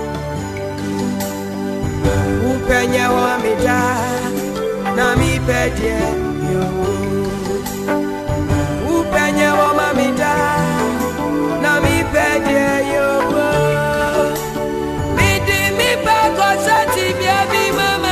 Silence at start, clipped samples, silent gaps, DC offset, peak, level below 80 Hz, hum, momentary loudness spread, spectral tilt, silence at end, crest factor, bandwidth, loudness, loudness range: 0 s; under 0.1%; none; under 0.1%; 0 dBFS; -32 dBFS; none; 7 LU; -5 dB/octave; 0 s; 16 dB; 15 kHz; -16 LUFS; 3 LU